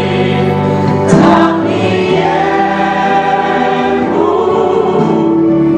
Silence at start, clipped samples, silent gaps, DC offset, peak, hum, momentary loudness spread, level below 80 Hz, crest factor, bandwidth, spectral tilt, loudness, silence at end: 0 s; 0.2%; none; under 0.1%; 0 dBFS; none; 4 LU; -42 dBFS; 10 dB; 9.6 kHz; -7 dB/octave; -11 LUFS; 0 s